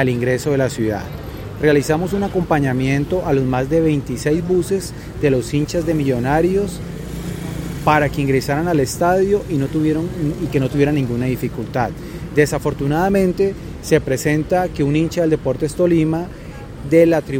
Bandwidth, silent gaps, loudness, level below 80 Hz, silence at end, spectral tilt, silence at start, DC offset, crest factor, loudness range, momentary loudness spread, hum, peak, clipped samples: 17 kHz; none; -18 LUFS; -36 dBFS; 0 s; -6.5 dB/octave; 0 s; under 0.1%; 18 dB; 2 LU; 11 LU; none; 0 dBFS; under 0.1%